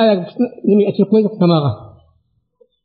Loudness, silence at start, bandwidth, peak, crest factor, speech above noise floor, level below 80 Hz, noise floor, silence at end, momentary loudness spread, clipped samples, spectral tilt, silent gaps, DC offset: -15 LUFS; 0 s; 4.9 kHz; -2 dBFS; 12 dB; 48 dB; -60 dBFS; -62 dBFS; 1 s; 8 LU; under 0.1%; -7 dB/octave; none; under 0.1%